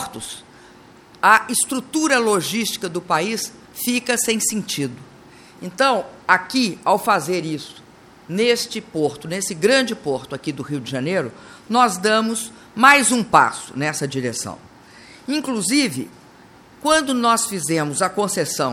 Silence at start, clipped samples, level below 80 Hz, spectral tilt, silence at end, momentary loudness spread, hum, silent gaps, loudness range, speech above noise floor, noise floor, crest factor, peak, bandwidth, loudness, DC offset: 0 s; under 0.1%; -60 dBFS; -3 dB/octave; 0 s; 14 LU; none; none; 5 LU; 27 dB; -47 dBFS; 20 dB; 0 dBFS; 17.5 kHz; -19 LUFS; under 0.1%